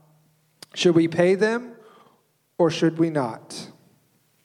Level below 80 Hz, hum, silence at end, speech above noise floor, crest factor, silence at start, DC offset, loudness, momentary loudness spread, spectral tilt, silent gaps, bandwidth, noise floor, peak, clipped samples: -72 dBFS; none; 0.8 s; 44 dB; 18 dB; 0.75 s; under 0.1%; -22 LUFS; 20 LU; -6 dB/octave; none; 11.5 kHz; -64 dBFS; -6 dBFS; under 0.1%